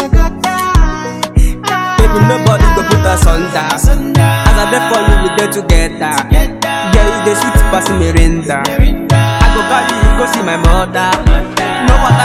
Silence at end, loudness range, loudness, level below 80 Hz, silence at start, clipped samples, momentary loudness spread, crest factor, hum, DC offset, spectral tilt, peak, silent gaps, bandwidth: 0 s; 1 LU; -11 LUFS; -12 dBFS; 0 s; 0.9%; 5 LU; 10 dB; none; under 0.1%; -5 dB/octave; 0 dBFS; none; 15.5 kHz